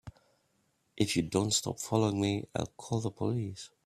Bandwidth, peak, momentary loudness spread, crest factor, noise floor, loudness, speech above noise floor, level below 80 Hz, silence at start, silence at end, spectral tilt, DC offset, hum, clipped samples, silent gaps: 15 kHz; -14 dBFS; 8 LU; 20 dB; -74 dBFS; -32 LUFS; 43 dB; -62 dBFS; 0.05 s; 0.2 s; -4.5 dB/octave; under 0.1%; none; under 0.1%; none